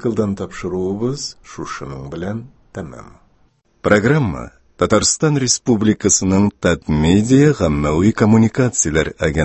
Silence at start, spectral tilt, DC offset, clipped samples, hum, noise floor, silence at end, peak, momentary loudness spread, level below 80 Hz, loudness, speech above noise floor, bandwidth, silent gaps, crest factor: 0 s; -5 dB/octave; under 0.1%; under 0.1%; none; -57 dBFS; 0 s; 0 dBFS; 17 LU; -34 dBFS; -16 LUFS; 41 dB; 8.6 kHz; none; 16 dB